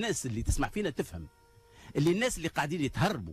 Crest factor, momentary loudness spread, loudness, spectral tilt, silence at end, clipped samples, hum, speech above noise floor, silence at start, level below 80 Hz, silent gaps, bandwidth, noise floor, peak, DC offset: 14 dB; 10 LU; -32 LUFS; -5 dB/octave; 0 s; under 0.1%; none; 23 dB; 0 s; -44 dBFS; none; 14.5 kHz; -54 dBFS; -18 dBFS; under 0.1%